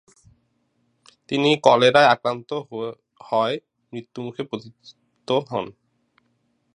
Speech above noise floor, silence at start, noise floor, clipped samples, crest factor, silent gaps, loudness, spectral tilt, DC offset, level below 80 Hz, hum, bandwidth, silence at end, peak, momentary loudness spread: 48 dB; 1.3 s; -68 dBFS; under 0.1%; 24 dB; none; -21 LUFS; -5 dB/octave; under 0.1%; -68 dBFS; none; 10.5 kHz; 1.05 s; 0 dBFS; 20 LU